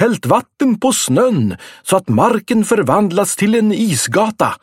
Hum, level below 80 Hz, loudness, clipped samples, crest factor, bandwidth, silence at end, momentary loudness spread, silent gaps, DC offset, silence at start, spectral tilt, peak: none; -54 dBFS; -14 LUFS; under 0.1%; 14 dB; 16.5 kHz; 0.05 s; 4 LU; none; under 0.1%; 0 s; -5 dB/octave; 0 dBFS